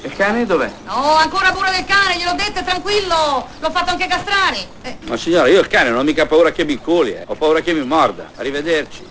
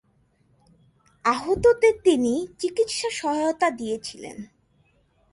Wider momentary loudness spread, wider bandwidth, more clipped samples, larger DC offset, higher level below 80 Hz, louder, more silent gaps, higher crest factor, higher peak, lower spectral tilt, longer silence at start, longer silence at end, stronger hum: second, 8 LU vs 15 LU; second, 8 kHz vs 11.5 kHz; neither; neither; first, -42 dBFS vs -54 dBFS; first, -16 LUFS vs -23 LUFS; neither; about the same, 16 dB vs 18 dB; first, 0 dBFS vs -6 dBFS; about the same, -3.5 dB/octave vs -4 dB/octave; second, 0 s vs 1.25 s; second, 0 s vs 0.85 s; neither